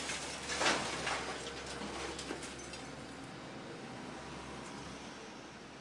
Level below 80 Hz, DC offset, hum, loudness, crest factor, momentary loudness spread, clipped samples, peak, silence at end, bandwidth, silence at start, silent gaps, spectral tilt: -62 dBFS; under 0.1%; none; -40 LUFS; 24 dB; 14 LU; under 0.1%; -18 dBFS; 0 s; 12 kHz; 0 s; none; -2.5 dB/octave